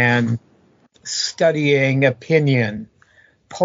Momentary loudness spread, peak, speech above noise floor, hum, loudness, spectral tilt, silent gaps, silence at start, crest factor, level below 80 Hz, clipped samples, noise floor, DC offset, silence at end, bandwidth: 15 LU; -2 dBFS; 38 dB; none; -18 LUFS; -5 dB/octave; none; 0 s; 18 dB; -60 dBFS; under 0.1%; -55 dBFS; under 0.1%; 0 s; 7.6 kHz